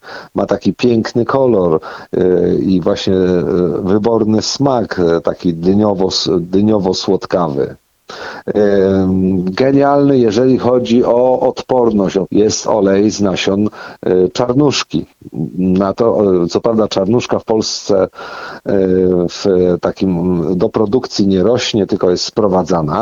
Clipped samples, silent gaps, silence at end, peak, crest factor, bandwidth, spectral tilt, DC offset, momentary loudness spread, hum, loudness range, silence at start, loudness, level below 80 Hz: under 0.1%; none; 0 s; 0 dBFS; 12 dB; 7.6 kHz; -6 dB/octave; under 0.1%; 6 LU; none; 3 LU; 0.05 s; -13 LUFS; -44 dBFS